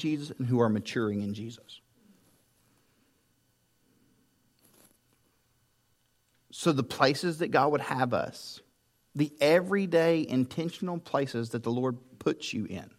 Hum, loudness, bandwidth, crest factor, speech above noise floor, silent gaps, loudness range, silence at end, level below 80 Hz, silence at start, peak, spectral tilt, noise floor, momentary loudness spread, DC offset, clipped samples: none; -29 LUFS; 16 kHz; 24 dB; 43 dB; none; 10 LU; 0.1 s; -74 dBFS; 0 s; -8 dBFS; -6 dB/octave; -72 dBFS; 14 LU; under 0.1%; under 0.1%